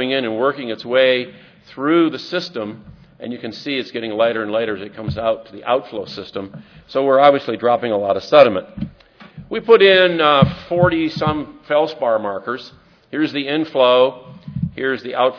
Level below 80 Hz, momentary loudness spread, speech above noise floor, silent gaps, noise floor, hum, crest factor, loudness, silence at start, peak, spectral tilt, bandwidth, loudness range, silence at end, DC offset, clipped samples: -48 dBFS; 17 LU; 27 dB; none; -44 dBFS; none; 18 dB; -17 LUFS; 0 s; 0 dBFS; -7 dB/octave; 5.4 kHz; 8 LU; 0 s; under 0.1%; under 0.1%